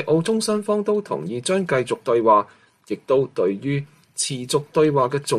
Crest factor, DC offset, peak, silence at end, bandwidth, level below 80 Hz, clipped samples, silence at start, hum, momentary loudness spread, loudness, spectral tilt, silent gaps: 16 dB; under 0.1%; -6 dBFS; 0 s; 13 kHz; -64 dBFS; under 0.1%; 0 s; none; 10 LU; -21 LUFS; -5 dB/octave; none